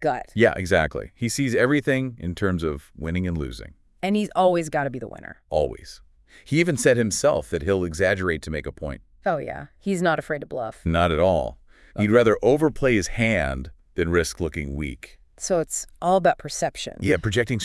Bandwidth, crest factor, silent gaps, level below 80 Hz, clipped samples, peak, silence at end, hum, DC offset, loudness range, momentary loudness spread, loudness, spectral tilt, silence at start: 12 kHz; 20 dB; none; -42 dBFS; under 0.1%; -4 dBFS; 0 s; none; under 0.1%; 4 LU; 14 LU; -23 LUFS; -5 dB/octave; 0 s